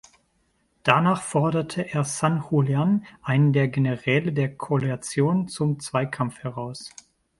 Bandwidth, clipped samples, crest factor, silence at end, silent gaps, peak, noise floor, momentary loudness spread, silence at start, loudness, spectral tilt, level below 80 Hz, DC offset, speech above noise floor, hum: 11.5 kHz; under 0.1%; 24 dB; 0.5 s; none; 0 dBFS; -68 dBFS; 9 LU; 0.85 s; -24 LUFS; -6 dB/octave; -60 dBFS; under 0.1%; 45 dB; none